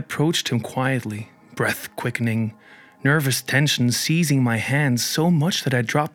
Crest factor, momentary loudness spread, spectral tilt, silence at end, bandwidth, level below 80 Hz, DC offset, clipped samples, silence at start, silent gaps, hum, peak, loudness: 16 dB; 8 LU; -4.5 dB/octave; 0.05 s; 18.5 kHz; -68 dBFS; under 0.1%; under 0.1%; 0 s; none; none; -4 dBFS; -21 LUFS